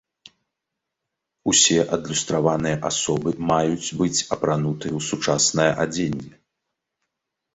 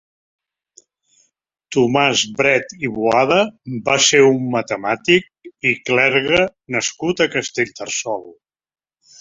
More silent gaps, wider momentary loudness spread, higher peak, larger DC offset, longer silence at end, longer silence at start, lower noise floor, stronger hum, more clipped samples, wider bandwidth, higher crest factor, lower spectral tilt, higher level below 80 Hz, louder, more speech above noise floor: neither; about the same, 10 LU vs 9 LU; about the same, -2 dBFS vs 0 dBFS; neither; first, 1.25 s vs 0.9 s; second, 1.45 s vs 1.7 s; first, -83 dBFS vs -66 dBFS; neither; neither; about the same, 8.4 kHz vs 7.8 kHz; about the same, 20 dB vs 18 dB; about the same, -3.5 dB/octave vs -3 dB/octave; about the same, -54 dBFS vs -56 dBFS; second, -21 LUFS vs -17 LUFS; first, 61 dB vs 49 dB